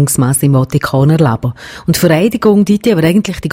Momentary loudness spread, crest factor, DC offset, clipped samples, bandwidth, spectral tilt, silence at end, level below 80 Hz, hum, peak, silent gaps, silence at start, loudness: 6 LU; 10 dB; under 0.1%; under 0.1%; 16.5 kHz; -6 dB/octave; 0 s; -38 dBFS; none; 0 dBFS; none; 0 s; -11 LUFS